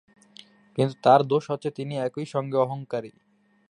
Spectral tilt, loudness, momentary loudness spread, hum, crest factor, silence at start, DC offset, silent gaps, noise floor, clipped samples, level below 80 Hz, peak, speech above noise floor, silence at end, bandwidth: -7 dB/octave; -25 LUFS; 14 LU; none; 22 dB; 0.75 s; under 0.1%; none; -52 dBFS; under 0.1%; -72 dBFS; -4 dBFS; 28 dB; 0.6 s; 10.5 kHz